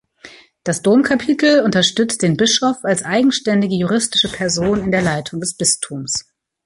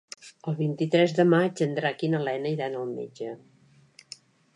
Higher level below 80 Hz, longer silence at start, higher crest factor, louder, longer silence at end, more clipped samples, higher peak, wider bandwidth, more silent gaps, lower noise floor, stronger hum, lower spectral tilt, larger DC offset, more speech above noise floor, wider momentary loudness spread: first, -48 dBFS vs -78 dBFS; about the same, 0.25 s vs 0.25 s; second, 14 dB vs 20 dB; first, -16 LUFS vs -26 LUFS; second, 0.45 s vs 1.2 s; neither; first, -2 dBFS vs -8 dBFS; about the same, 11.5 kHz vs 11 kHz; neither; second, -43 dBFS vs -56 dBFS; neither; second, -3.5 dB/octave vs -6.5 dB/octave; neither; second, 27 dB vs 31 dB; second, 8 LU vs 24 LU